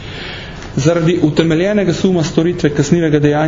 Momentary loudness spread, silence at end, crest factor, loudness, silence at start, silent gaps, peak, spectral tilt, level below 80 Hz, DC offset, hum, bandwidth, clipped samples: 13 LU; 0 s; 14 dB; -14 LUFS; 0 s; none; 0 dBFS; -6.5 dB/octave; -38 dBFS; under 0.1%; none; 7.6 kHz; under 0.1%